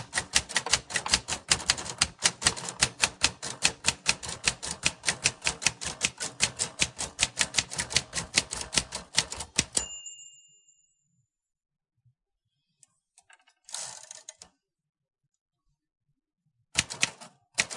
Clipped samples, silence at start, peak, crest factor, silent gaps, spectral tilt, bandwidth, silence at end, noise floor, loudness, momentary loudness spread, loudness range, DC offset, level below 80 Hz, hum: under 0.1%; 0 s; -4 dBFS; 28 dB; 15.41-15.46 s; 0 dB/octave; 11.5 kHz; 0 s; -82 dBFS; -27 LUFS; 12 LU; 19 LU; under 0.1%; -54 dBFS; none